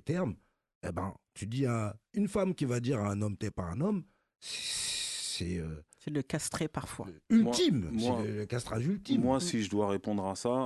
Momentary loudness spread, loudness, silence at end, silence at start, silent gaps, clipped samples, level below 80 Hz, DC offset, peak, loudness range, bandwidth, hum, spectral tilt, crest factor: 12 LU; -33 LUFS; 0 s; 0.05 s; 0.75-0.81 s; under 0.1%; -54 dBFS; under 0.1%; -16 dBFS; 5 LU; 12.5 kHz; none; -5 dB/octave; 18 dB